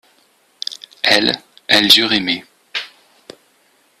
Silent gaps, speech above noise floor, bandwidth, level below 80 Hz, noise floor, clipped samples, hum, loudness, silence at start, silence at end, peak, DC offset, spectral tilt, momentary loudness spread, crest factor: none; 42 dB; 16.5 kHz; -60 dBFS; -57 dBFS; under 0.1%; none; -14 LUFS; 0.7 s; 1.15 s; 0 dBFS; under 0.1%; -2 dB/octave; 18 LU; 18 dB